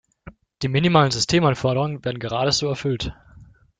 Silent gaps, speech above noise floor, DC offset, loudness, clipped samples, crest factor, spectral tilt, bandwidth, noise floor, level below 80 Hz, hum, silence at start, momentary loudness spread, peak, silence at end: none; 28 dB; under 0.1%; -21 LUFS; under 0.1%; 20 dB; -5 dB/octave; 9.4 kHz; -49 dBFS; -46 dBFS; none; 0.25 s; 11 LU; -2 dBFS; 0.35 s